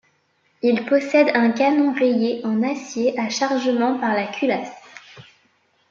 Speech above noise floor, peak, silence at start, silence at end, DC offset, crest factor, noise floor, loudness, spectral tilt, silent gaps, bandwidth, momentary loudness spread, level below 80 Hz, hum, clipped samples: 45 dB; -2 dBFS; 0.65 s; 0.7 s; under 0.1%; 18 dB; -64 dBFS; -20 LUFS; -4.5 dB/octave; none; 7.4 kHz; 7 LU; -72 dBFS; none; under 0.1%